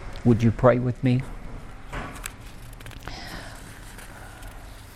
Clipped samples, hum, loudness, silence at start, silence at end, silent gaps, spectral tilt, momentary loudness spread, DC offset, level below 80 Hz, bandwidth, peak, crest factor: under 0.1%; none; -24 LUFS; 0 s; 0 s; none; -7 dB/octave; 22 LU; under 0.1%; -40 dBFS; 14.5 kHz; -4 dBFS; 22 dB